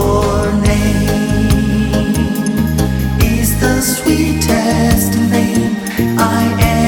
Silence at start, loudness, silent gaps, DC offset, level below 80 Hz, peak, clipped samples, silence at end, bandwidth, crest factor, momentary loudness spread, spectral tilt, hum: 0 s; -13 LUFS; none; under 0.1%; -22 dBFS; 0 dBFS; under 0.1%; 0 s; 17.5 kHz; 12 dB; 3 LU; -5.5 dB/octave; none